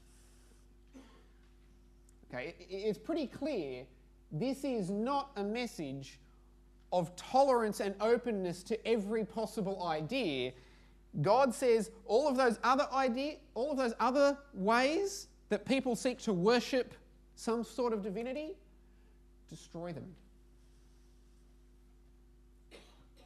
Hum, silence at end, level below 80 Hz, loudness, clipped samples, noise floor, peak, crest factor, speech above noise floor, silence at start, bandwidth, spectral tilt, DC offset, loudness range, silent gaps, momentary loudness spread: none; 0.45 s; -62 dBFS; -34 LUFS; under 0.1%; -61 dBFS; -16 dBFS; 20 dB; 28 dB; 0.95 s; 13.5 kHz; -5 dB/octave; under 0.1%; 14 LU; none; 15 LU